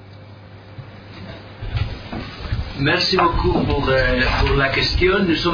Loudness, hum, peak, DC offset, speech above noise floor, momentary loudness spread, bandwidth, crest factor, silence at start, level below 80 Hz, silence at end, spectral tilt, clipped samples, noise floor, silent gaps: -18 LUFS; none; -4 dBFS; under 0.1%; 23 dB; 21 LU; 5.4 kHz; 16 dB; 0 s; -28 dBFS; 0 s; -6 dB/octave; under 0.1%; -40 dBFS; none